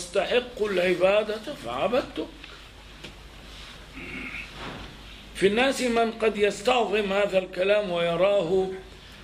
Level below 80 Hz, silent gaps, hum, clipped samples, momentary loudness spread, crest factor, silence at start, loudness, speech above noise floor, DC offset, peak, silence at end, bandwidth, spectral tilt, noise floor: -50 dBFS; none; none; under 0.1%; 21 LU; 18 dB; 0 s; -25 LUFS; 21 dB; under 0.1%; -8 dBFS; 0 s; 15.5 kHz; -4.5 dB/octave; -45 dBFS